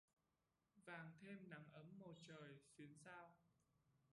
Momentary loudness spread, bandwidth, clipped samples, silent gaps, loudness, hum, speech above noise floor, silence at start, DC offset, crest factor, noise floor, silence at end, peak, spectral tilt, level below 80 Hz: 6 LU; 11 kHz; under 0.1%; none; -62 LUFS; none; 28 dB; 0.75 s; under 0.1%; 20 dB; -90 dBFS; 0 s; -44 dBFS; -5.5 dB/octave; under -90 dBFS